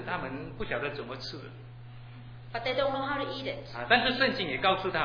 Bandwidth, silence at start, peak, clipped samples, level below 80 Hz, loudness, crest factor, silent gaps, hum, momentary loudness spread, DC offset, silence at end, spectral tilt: 5.4 kHz; 0 s; -6 dBFS; under 0.1%; -54 dBFS; -30 LUFS; 24 dB; none; none; 22 LU; under 0.1%; 0 s; -6 dB/octave